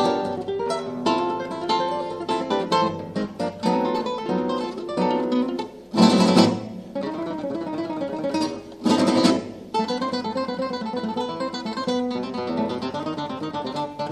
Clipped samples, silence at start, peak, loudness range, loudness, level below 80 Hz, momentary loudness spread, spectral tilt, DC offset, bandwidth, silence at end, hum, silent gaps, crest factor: under 0.1%; 0 s; 0 dBFS; 5 LU; -24 LUFS; -60 dBFS; 10 LU; -5.5 dB/octave; under 0.1%; 12.5 kHz; 0 s; none; none; 22 dB